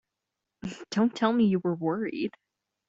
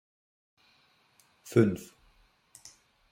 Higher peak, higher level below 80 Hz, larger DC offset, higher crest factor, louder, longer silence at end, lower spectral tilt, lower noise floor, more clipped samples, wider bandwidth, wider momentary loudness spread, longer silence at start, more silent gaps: about the same, -10 dBFS vs -8 dBFS; about the same, -68 dBFS vs -68 dBFS; neither; second, 20 dB vs 26 dB; about the same, -27 LUFS vs -28 LUFS; second, 0.6 s vs 1.35 s; about the same, -7 dB/octave vs -7.5 dB/octave; first, -86 dBFS vs -67 dBFS; neither; second, 7.8 kHz vs 16.5 kHz; second, 16 LU vs 27 LU; second, 0.65 s vs 1.45 s; neither